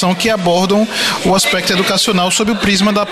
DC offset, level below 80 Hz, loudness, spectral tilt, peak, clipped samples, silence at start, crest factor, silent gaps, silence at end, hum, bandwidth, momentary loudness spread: under 0.1%; -42 dBFS; -12 LUFS; -3.5 dB/octave; -2 dBFS; under 0.1%; 0 s; 12 dB; none; 0 s; none; 13.5 kHz; 2 LU